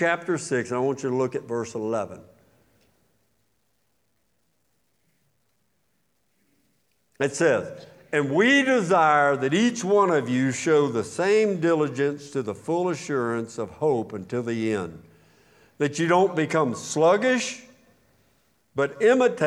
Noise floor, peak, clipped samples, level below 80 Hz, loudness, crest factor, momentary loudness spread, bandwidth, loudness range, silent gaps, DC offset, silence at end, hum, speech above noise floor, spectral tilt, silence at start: -72 dBFS; -6 dBFS; under 0.1%; -72 dBFS; -23 LUFS; 18 dB; 11 LU; 12 kHz; 10 LU; none; under 0.1%; 0 s; none; 50 dB; -5 dB/octave; 0 s